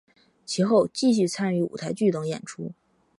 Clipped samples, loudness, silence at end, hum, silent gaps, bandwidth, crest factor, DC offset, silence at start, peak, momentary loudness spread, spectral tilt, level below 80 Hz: under 0.1%; -24 LUFS; 0.45 s; none; none; 11.5 kHz; 16 dB; under 0.1%; 0.5 s; -8 dBFS; 14 LU; -5.5 dB/octave; -70 dBFS